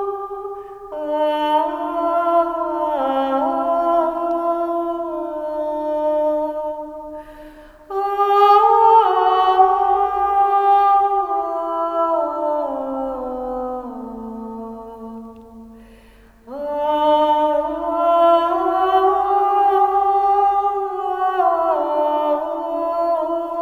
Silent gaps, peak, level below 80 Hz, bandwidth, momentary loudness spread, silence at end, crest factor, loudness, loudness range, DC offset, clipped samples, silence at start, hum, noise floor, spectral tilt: none; 0 dBFS; -52 dBFS; 13 kHz; 16 LU; 0 s; 18 dB; -18 LUFS; 10 LU; under 0.1%; under 0.1%; 0 s; none; -47 dBFS; -5.5 dB/octave